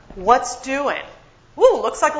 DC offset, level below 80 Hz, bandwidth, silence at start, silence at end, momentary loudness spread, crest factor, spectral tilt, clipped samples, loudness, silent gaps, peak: under 0.1%; -48 dBFS; 8 kHz; 0.1 s; 0 s; 8 LU; 20 dB; -3 dB/octave; under 0.1%; -18 LUFS; none; 0 dBFS